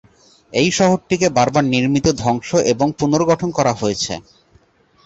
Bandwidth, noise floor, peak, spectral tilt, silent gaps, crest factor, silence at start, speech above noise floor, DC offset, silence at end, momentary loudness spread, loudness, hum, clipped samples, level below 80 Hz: 8.2 kHz; -54 dBFS; -2 dBFS; -5 dB/octave; none; 16 dB; 0.5 s; 38 dB; under 0.1%; 0.85 s; 6 LU; -17 LUFS; none; under 0.1%; -46 dBFS